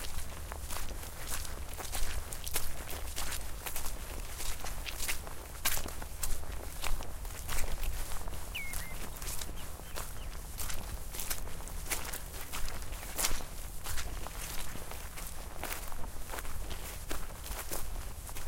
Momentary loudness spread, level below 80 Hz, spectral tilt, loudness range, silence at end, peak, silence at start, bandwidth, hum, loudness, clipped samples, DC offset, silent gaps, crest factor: 7 LU; -40 dBFS; -2.5 dB/octave; 4 LU; 0 s; -8 dBFS; 0 s; 17 kHz; none; -40 LUFS; under 0.1%; under 0.1%; none; 26 dB